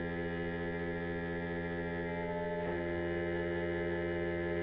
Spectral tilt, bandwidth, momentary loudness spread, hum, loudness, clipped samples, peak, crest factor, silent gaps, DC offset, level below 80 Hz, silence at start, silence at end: -6 dB/octave; 5 kHz; 2 LU; none; -37 LUFS; under 0.1%; -26 dBFS; 10 dB; none; under 0.1%; -54 dBFS; 0 s; 0 s